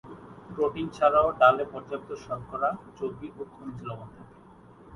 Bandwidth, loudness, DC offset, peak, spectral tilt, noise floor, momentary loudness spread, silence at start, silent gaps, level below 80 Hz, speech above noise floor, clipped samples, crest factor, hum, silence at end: 11 kHz; -27 LUFS; under 0.1%; -6 dBFS; -6.5 dB/octave; -52 dBFS; 21 LU; 0.05 s; none; -56 dBFS; 24 dB; under 0.1%; 22 dB; none; 0 s